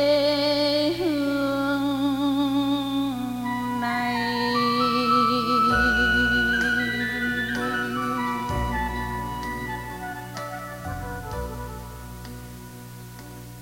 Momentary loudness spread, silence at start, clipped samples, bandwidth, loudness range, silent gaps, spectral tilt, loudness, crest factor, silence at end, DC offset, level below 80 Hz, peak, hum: 19 LU; 0 s; under 0.1%; 16.5 kHz; 13 LU; none; -5 dB/octave; -24 LUFS; 16 dB; 0 s; under 0.1%; -40 dBFS; -10 dBFS; 60 Hz at -40 dBFS